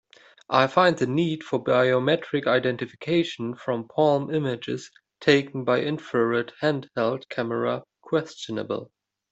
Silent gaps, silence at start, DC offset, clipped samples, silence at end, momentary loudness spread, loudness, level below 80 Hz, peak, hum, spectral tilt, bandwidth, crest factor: none; 0.5 s; under 0.1%; under 0.1%; 0.45 s; 10 LU; -25 LUFS; -66 dBFS; -4 dBFS; none; -6 dB/octave; 8.2 kHz; 20 dB